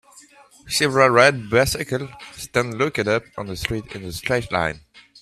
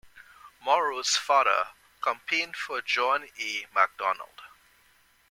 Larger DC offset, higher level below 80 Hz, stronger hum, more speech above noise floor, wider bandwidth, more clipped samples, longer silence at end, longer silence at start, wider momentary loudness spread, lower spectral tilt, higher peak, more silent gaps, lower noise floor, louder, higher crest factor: neither; first, -46 dBFS vs -72 dBFS; neither; second, 29 dB vs 36 dB; about the same, 15.5 kHz vs 17 kHz; neither; second, 0.2 s vs 0.85 s; about the same, 0.15 s vs 0.15 s; first, 16 LU vs 10 LU; first, -4 dB/octave vs 0.5 dB/octave; first, 0 dBFS vs -8 dBFS; neither; second, -49 dBFS vs -63 dBFS; first, -20 LUFS vs -27 LUFS; about the same, 22 dB vs 22 dB